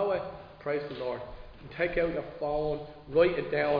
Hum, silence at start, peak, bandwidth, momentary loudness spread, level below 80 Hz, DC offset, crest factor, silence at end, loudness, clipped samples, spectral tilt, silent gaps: none; 0 s; -12 dBFS; 5.2 kHz; 16 LU; -50 dBFS; under 0.1%; 18 dB; 0 s; -31 LUFS; under 0.1%; -4.5 dB/octave; none